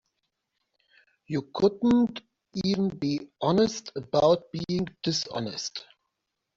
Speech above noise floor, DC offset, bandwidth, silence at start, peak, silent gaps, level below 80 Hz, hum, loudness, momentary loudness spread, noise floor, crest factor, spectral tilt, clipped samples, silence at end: 56 dB; under 0.1%; 7.8 kHz; 1.3 s; -10 dBFS; none; -60 dBFS; none; -27 LUFS; 12 LU; -83 dBFS; 18 dB; -5.5 dB/octave; under 0.1%; 0.75 s